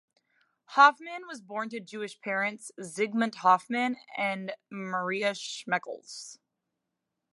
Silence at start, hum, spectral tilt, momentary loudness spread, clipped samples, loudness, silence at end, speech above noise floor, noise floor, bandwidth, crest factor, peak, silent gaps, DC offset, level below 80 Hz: 0.7 s; none; -3.5 dB/octave; 20 LU; under 0.1%; -28 LUFS; 0.95 s; 55 dB; -85 dBFS; 11.5 kHz; 24 dB; -6 dBFS; none; under 0.1%; -86 dBFS